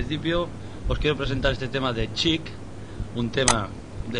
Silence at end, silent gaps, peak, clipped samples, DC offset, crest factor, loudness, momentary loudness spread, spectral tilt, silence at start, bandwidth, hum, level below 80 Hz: 0 s; none; 0 dBFS; under 0.1%; 0.9%; 26 dB; -25 LUFS; 15 LU; -4 dB/octave; 0 s; 10 kHz; none; -36 dBFS